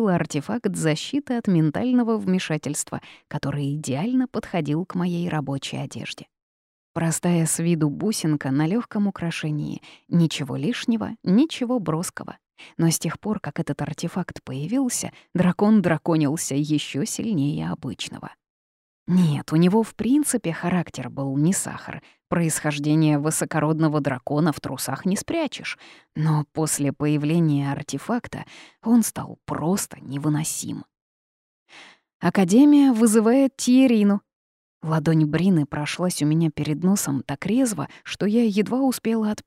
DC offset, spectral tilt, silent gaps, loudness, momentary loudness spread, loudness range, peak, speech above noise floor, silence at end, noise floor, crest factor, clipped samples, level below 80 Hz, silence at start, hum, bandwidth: under 0.1%; -5.5 dB/octave; 6.42-6.95 s, 18.50-19.06 s, 31.02-31.66 s, 32.14-32.20 s, 34.35-34.81 s; -23 LUFS; 13 LU; 7 LU; -6 dBFS; over 68 dB; 0.05 s; under -90 dBFS; 16 dB; under 0.1%; -58 dBFS; 0 s; none; 16 kHz